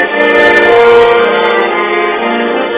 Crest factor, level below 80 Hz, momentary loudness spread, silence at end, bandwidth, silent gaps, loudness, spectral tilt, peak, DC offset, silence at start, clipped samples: 8 dB; -44 dBFS; 7 LU; 0 s; 4 kHz; none; -8 LUFS; -7.5 dB/octave; 0 dBFS; under 0.1%; 0 s; 2%